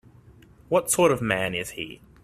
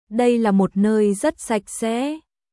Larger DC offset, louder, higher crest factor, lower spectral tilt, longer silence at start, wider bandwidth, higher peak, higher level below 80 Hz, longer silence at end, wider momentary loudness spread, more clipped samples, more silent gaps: neither; second, -24 LUFS vs -20 LUFS; first, 20 dB vs 14 dB; second, -3.5 dB/octave vs -6 dB/octave; first, 0.7 s vs 0.1 s; first, 15 kHz vs 12 kHz; about the same, -6 dBFS vs -6 dBFS; about the same, -56 dBFS vs -56 dBFS; about the same, 0.3 s vs 0.35 s; first, 15 LU vs 7 LU; neither; neither